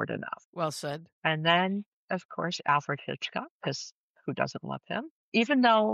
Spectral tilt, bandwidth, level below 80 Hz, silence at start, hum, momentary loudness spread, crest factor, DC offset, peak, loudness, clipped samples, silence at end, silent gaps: -5 dB/octave; 12.5 kHz; -78 dBFS; 0 s; none; 14 LU; 18 dB; under 0.1%; -12 dBFS; -30 LUFS; under 0.1%; 0 s; 0.45-0.53 s, 1.12-1.22 s, 1.86-2.08 s, 2.25-2.29 s, 3.50-3.60 s, 3.92-4.15 s, 5.10-5.32 s